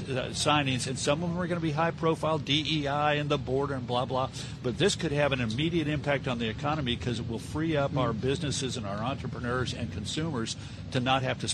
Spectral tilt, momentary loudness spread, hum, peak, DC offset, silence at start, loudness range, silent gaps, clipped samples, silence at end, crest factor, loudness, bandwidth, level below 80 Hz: -5 dB/octave; 7 LU; none; -12 dBFS; under 0.1%; 0 s; 3 LU; none; under 0.1%; 0 s; 18 dB; -29 LUFS; 12.5 kHz; -50 dBFS